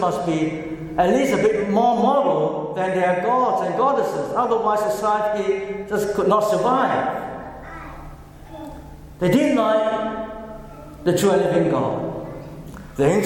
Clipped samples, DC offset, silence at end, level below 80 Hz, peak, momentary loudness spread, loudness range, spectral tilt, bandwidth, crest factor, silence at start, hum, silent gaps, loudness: under 0.1%; under 0.1%; 0 s; -46 dBFS; -4 dBFS; 19 LU; 4 LU; -6 dB/octave; 17.5 kHz; 16 dB; 0 s; none; none; -20 LUFS